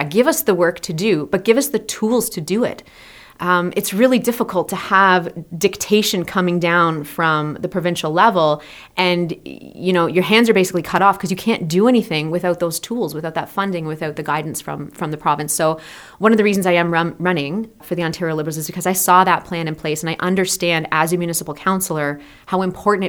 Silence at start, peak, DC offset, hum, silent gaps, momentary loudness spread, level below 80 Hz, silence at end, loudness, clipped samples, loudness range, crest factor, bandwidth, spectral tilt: 0 s; 0 dBFS; under 0.1%; none; none; 11 LU; -54 dBFS; 0 s; -18 LUFS; under 0.1%; 3 LU; 18 dB; over 20 kHz; -4.5 dB/octave